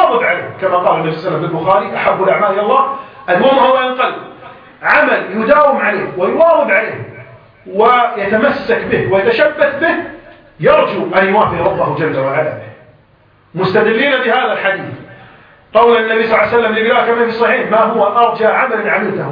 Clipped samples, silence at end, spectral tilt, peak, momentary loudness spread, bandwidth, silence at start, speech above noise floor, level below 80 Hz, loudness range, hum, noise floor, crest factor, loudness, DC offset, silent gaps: under 0.1%; 0 s; -8 dB/octave; 0 dBFS; 8 LU; 5.2 kHz; 0 s; 37 dB; -50 dBFS; 3 LU; none; -49 dBFS; 12 dB; -12 LUFS; under 0.1%; none